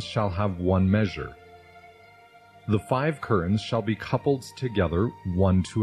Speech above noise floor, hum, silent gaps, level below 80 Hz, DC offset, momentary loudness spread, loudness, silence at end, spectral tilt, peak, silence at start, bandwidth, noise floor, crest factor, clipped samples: 28 dB; 50 Hz at -50 dBFS; none; -48 dBFS; under 0.1%; 6 LU; -26 LUFS; 0 s; -7.5 dB/octave; -8 dBFS; 0 s; 11.5 kHz; -53 dBFS; 18 dB; under 0.1%